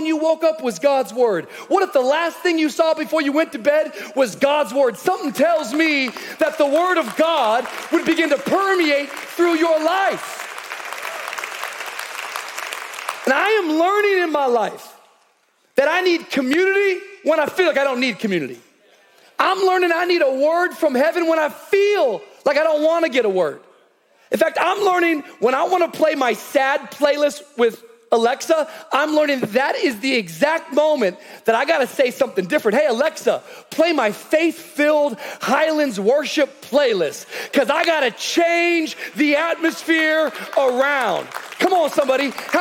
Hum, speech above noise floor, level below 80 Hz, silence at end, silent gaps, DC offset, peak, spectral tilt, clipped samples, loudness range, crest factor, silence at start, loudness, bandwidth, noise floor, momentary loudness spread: none; 43 dB; -76 dBFS; 0 s; none; under 0.1%; 0 dBFS; -3.5 dB/octave; under 0.1%; 2 LU; 18 dB; 0 s; -19 LUFS; 17.5 kHz; -61 dBFS; 9 LU